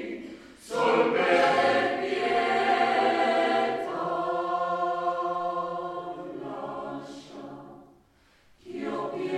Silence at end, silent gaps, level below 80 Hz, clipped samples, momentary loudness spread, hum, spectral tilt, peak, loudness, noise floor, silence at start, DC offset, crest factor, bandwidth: 0 s; none; -68 dBFS; under 0.1%; 19 LU; none; -4.5 dB/octave; -10 dBFS; -26 LUFS; -61 dBFS; 0 s; under 0.1%; 18 dB; 12.5 kHz